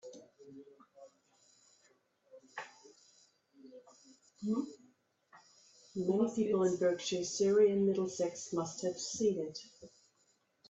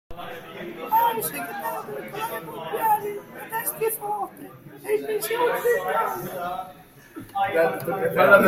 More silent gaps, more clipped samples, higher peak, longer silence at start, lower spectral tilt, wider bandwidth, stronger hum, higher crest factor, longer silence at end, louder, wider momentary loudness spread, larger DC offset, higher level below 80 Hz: neither; neither; second, -18 dBFS vs -2 dBFS; about the same, 0.05 s vs 0.1 s; about the same, -5 dB/octave vs -4 dB/octave; second, 8.2 kHz vs 16.5 kHz; neither; second, 18 dB vs 24 dB; first, 0.85 s vs 0 s; second, -34 LUFS vs -25 LUFS; first, 26 LU vs 15 LU; neither; second, -78 dBFS vs -60 dBFS